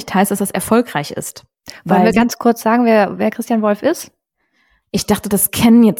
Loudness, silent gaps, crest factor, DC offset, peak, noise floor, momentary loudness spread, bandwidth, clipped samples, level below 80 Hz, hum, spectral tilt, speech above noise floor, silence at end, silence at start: -15 LUFS; none; 14 dB; under 0.1%; -2 dBFS; -63 dBFS; 13 LU; 18 kHz; under 0.1%; -46 dBFS; none; -5 dB/octave; 49 dB; 0 s; 0 s